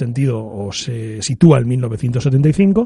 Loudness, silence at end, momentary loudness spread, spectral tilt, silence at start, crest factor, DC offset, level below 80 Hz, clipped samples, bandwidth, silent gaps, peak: -16 LUFS; 0 s; 12 LU; -7 dB/octave; 0 s; 14 dB; under 0.1%; -44 dBFS; under 0.1%; 11.5 kHz; none; 0 dBFS